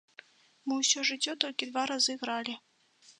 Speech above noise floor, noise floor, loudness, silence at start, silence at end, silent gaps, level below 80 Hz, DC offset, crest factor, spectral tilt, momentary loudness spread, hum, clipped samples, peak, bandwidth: 31 dB; -62 dBFS; -30 LUFS; 0.65 s; 0.1 s; none; -88 dBFS; under 0.1%; 28 dB; 0.5 dB/octave; 12 LU; none; under 0.1%; -6 dBFS; 11 kHz